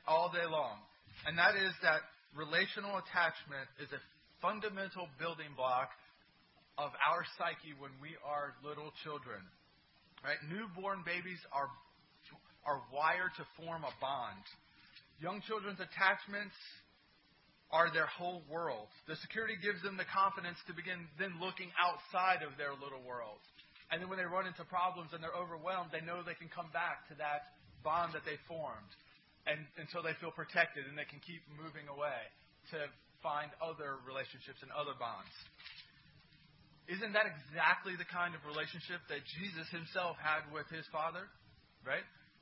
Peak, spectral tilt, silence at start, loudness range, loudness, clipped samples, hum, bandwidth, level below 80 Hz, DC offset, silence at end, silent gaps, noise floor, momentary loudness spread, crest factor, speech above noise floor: -16 dBFS; -1.5 dB/octave; 0.05 s; 7 LU; -39 LUFS; under 0.1%; none; 5.6 kHz; -78 dBFS; under 0.1%; 0.2 s; none; -70 dBFS; 16 LU; 26 dB; 30 dB